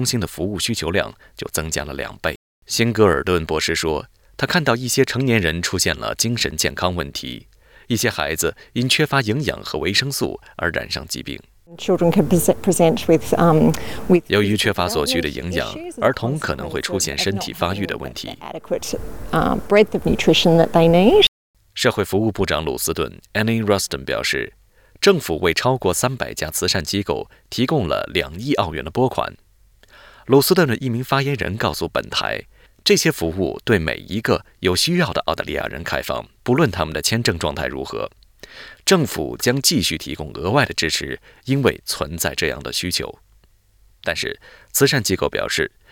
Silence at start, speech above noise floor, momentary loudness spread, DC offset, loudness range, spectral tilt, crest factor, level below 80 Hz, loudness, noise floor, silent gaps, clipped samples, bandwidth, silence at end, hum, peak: 0 s; 35 dB; 11 LU; under 0.1%; 5 LU; -4 dB/octave; 18 dB; -42 dBFS; -19 LUFS; -54 dBFS; 2.36-2.62 s, 21.28-21.54 s; under 0.1%; 19.5 kHz; 0.25 s; none; -2 dBFS